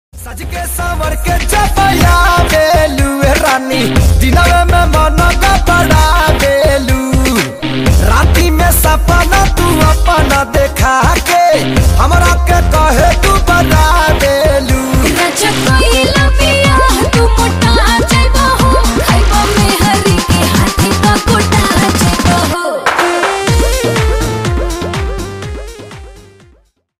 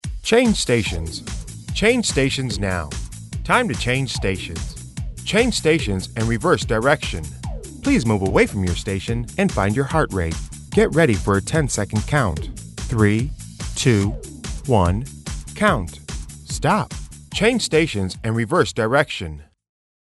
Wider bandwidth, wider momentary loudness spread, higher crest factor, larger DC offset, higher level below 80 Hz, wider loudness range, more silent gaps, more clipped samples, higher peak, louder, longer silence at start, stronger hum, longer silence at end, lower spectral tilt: first, 16 kHz vs 12 kHz; second, 6 LU vs 15 LU; second, 10 dB vs 18 dB; neither; first, -14 dBFS vs -34 dBFS; about the same, 2 LU vs 2 LU; neither; neither; about the same, 0 dBFS vs -2 dBFS; first, -10 LUFS vs -20 LUFS; about the same, 0.15 s vs 0.05 s; neither; about the same, 0.8 s vs 0.7 s; about the same, -4.5 dB/octave vs -5 dB/octave